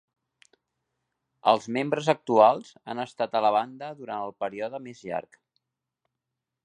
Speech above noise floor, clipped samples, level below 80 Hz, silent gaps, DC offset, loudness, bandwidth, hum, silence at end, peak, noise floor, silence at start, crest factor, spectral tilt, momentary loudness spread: 60 dB; under 0.1%; -76 dBFS; none; under 0.1%; -26 LUFS; 10.5 kHz; none; 1.45 s; -4 dBFS; -86 dBFS; 1.45 s; 24 dB; -5.5 dB/octave; 16 LU